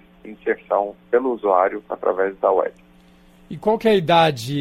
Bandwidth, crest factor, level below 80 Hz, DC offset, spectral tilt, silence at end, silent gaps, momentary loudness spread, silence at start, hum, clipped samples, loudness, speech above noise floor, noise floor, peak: 16 kHz; 16 dB; -56 dBFS; under 0.1%; -6 dB/octave; 0 s; none; 9 LU; 0.25 s; none; under 0.1%; -20 LUFS; 31 dB; -50 dBFS; -4 dBFS